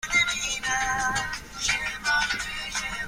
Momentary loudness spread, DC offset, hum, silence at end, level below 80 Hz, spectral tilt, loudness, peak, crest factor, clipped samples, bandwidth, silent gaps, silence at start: 7 LU; under 0.1%; none; 0 s; -46 dBFS; 0 dB/octave; -26 LUFS; -10 dBFS; 16 dB; under 0.1%; 16 kHz; none; 0.05 s